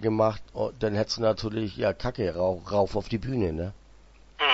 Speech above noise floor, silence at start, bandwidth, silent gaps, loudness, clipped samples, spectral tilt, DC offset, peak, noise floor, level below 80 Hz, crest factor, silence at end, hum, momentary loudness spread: 25 dB; 0 s; 8 kHz; none; -28 LUFS; under 0.1%; -5.5 dB/octave; under 0.1%; -10 dBFS; -52 dBFS; -46 dBFS; 18 dB; 0 s; none; 6 LU